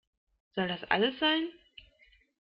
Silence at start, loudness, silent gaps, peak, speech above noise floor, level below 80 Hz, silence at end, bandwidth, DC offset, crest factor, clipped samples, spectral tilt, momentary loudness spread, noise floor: 0.55 s; -30 LUFS; none; -10 dBFS; 35 dB; -68 dBFS; 0.9 s; 5.4 kHz; under 0.1%; 24 dB; under 0.1%; -7.5 dB/octave; 12 LU; -65 dBFS